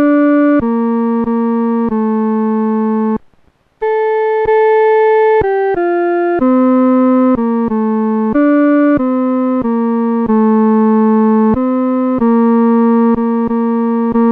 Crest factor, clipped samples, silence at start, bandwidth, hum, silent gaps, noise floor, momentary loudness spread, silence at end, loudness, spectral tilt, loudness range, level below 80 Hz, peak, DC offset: 8 dB; under 0.1%; 0 s; 3.7 kHz; none; none; -52 dBFS; 4 LU; 0 s; -12 LUFS; -10.5 dB/octave; 3 LU; -44 dBFS; -4 dBFS; under 0.1%